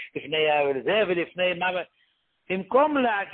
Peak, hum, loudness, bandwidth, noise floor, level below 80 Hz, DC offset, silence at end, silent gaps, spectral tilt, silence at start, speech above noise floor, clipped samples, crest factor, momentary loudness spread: -8 dBFS; none; -24 LUFS; 4.3 kHz; -68 dBFS; -66 dBFS; under 0.1%; 0 s; none; -9 dB/octave; 0 s; 44 dB; under 0.1%; 18 dB; 10 LU